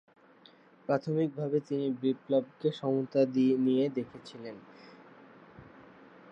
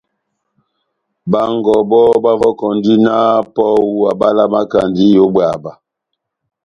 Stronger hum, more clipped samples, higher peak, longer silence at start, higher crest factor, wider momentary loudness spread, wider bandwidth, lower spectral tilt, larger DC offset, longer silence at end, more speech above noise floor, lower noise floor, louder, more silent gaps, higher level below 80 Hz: neither; neither; second, -14 dBFS vs 0 dBFS; second, 0.9 s vs 1.25 s; first, 18 dB vs 12 dB; first, 18 LU vs 7 LU; second, 7.8 kHz vs 9.2 kHz; about the same, -8.5 dB/octave vs -8 dB/octave; neither; second, 0.5 s vs 0.95 s; second, 29 dB vs 64 dB; second, -59 dBFS vs -75 dBFS; second, -30 LUFS vs -12 LUFS; neither; second, -78 dBFS vs -50 dBFS